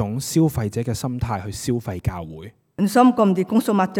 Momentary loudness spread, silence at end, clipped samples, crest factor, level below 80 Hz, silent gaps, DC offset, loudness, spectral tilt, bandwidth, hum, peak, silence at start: 15 LU; 0 s; under 0.1%; 18 dB; -44 dBFS; none; under 0.1%; -21 LUFS; -6.5 dB/octave; 18.5 kHz; none; -2 dBFS; 0 s